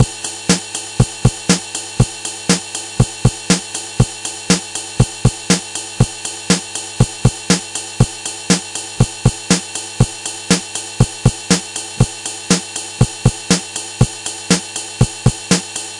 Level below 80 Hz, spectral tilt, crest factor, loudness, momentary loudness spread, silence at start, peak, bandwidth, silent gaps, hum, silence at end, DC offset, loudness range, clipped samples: -32 dBFS; -4 dB/octave; 18 dB; -17 LUFS; 9 LU; 0 s; 0 dBFS; 11.5 kHz; none; none; 0 s; under 0.1%; 0 LU; under 0.1%